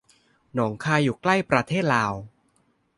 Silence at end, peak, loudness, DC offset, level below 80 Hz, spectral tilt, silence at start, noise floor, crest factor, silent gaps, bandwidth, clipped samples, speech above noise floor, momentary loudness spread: 0.7 s; -4 dBFS; -23 LUFS; under 0.1%; -58 dBFS; -6 dB/octave; 0.55 s; -67 dBFS; 22 dB; none; 11.5 kHz; under 0.1%; 44 dB; 8 LU